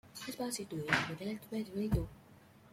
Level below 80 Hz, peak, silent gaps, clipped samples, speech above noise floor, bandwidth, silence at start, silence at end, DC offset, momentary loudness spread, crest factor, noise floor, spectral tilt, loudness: -52 dBFS; -16 dBFS; none; under 0.1%; 23 dB; 16.5 kHz; 0.05 s; 0.05 s; under 0.1%; 9 LU; 24 dB; -60 dBFS; -4.5 dB/octave; -38 LUFS